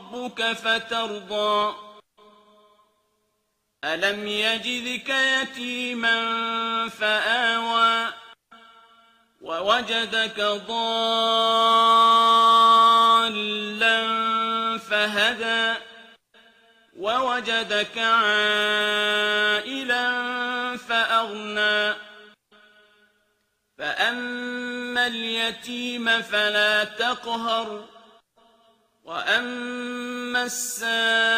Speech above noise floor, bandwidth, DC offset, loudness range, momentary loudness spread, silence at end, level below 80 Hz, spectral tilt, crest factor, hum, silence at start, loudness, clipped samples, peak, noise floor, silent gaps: 51 dB; 15.5 kHz; under 0.1%; 11 LU; 13 LU; 0 s; -70 dBFS; -1.5 dB/octave; 18 dB; none; 0 s; -22 LUFS; under 0.1%; -6 dBFS; -74 dBFS; none